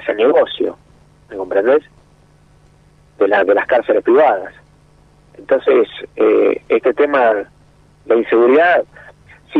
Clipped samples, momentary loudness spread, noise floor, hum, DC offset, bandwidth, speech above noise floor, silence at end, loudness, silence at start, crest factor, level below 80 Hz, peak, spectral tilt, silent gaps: under 0.1%; 10 LU; -49 dBFS; 50 Hz at -50 dBFS; under 0.1%; 4.9 kHz; 36 dB; 0 s; -14 LUFS; 0 s; 14 dB; -54 dBFS; -2 dBFS; -6.5 dB/octave; none